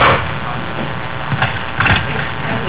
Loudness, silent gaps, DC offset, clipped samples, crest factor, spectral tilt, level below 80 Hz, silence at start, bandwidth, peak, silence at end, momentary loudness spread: -17 LUFS; none; 5%; under 0.1%; 14 dB; -9 dB/octave; -32 dBFS; 0 s; 4 kHz; -4 dBFS; 0 s; 9 LU